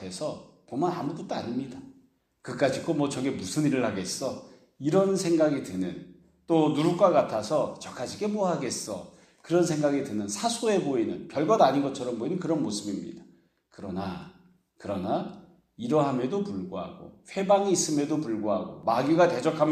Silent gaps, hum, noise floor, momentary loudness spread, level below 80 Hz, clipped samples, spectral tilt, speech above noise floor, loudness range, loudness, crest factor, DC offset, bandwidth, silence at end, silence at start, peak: none; none; -63 dBFS; 15 LU; -68 dBFS; under 0.1%; -5.5 dB/octave; 36 dB; 6 LU; -27 LUFS; 20 dB; under 0.1%; 14.5 kHz; 0 s; 0 s; -8 dBFS